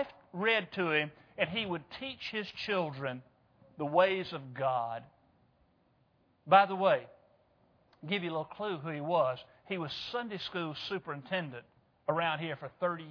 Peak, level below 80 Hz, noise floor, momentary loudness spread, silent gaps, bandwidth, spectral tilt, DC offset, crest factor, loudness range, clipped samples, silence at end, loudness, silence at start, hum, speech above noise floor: -10 dBFS; -74 dBFS; -71 dBFS; 12 LU; none; 5.4 kHz; -6.5 dB/octave; under 0.1%; 24 dB; 5 LU; under 0.1%; 0 s; -33 LUFS; 0 s; none; 38 dB